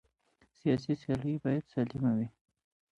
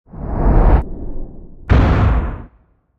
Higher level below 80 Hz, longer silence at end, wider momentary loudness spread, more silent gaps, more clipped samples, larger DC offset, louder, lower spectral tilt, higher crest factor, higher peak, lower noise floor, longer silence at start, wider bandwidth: second, -62 dBFS vs -18 dBFS; first, 0.7 s vs 0.55 s; second, 4 LU vs 21 LU; neither; neither; neither; second, -33 LUFS vs -16 LUFS; about the same, -9 dB/octave vs -9.5 dB/octave; about the same, 16 dB vs 14 dB; second, -18 dBFS vs 0 dBFS; first, -71 dBFS vs -54 dBFS; first, 0.65 s vs 0.15 s; first, 9 kHz vs 5.2 kHz